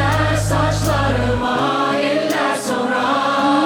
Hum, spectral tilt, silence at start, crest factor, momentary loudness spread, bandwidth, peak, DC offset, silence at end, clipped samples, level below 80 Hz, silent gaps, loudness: none; -5 dB/octave; 0 s; 12 dB; 2 LU; 19 kHz; -4 dBFS; under 0.1%; 0 s; under 0.1%; -32 dBFS; none; -17 LUFS